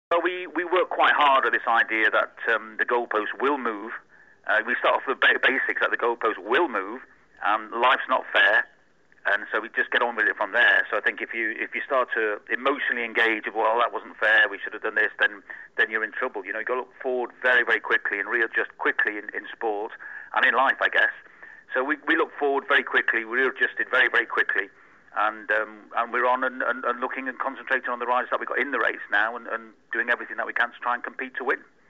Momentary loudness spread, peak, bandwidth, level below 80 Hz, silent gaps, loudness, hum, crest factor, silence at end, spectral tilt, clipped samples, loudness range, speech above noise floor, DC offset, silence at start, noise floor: 11 LU; -10 dBFS; 8 kHz; -74 dBFS; none; -23 LUFS; none; 16 dB; 0.3 s; -3.5 dB/octave; under 0.1%; 4 LU; 36 dB; under 0.1%; 0.1 s; -61 dBFS